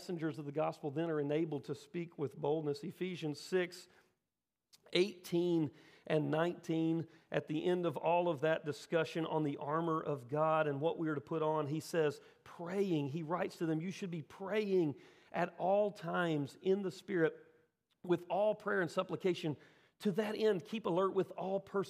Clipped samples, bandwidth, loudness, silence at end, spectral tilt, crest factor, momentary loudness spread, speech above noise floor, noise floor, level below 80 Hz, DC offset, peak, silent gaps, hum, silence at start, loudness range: under 0.1%; 15.5 kHz; -37 LUFS; 0 s; -6.5 dB/octave; 20 dB; 8 LU; over 54 dB; under -90 dBFS; -88 dBFS; under 0.1%; -18 dBFS; none; none; 0 s; 3 LU